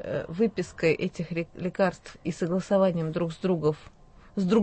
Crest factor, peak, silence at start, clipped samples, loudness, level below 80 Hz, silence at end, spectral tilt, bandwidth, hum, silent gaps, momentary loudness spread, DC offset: 16 dB; -10 dBFS; 0 s; under 0.1%; -28 LUFS; -56 dBFS; 0 s; -7 dB/octave; 8.8 kHz; none; none; 9 LU; under 0.1%